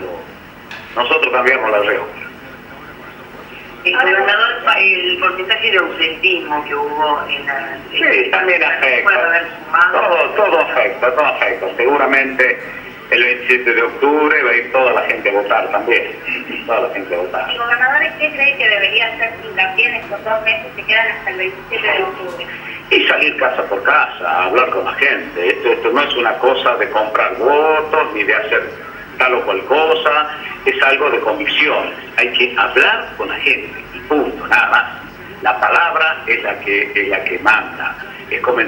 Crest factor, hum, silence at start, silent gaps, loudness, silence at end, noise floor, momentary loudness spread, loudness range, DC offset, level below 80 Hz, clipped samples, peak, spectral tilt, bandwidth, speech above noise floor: 16 dB; none; 0 s; none; -14 LUFS; 0 s; -35 dBFS; 11 LU; 3 LU; under 0.1%; -52 dBFS; under 0.1%; 0 dBFS; -4 dB/octave; 16.5 kHz; 20 dB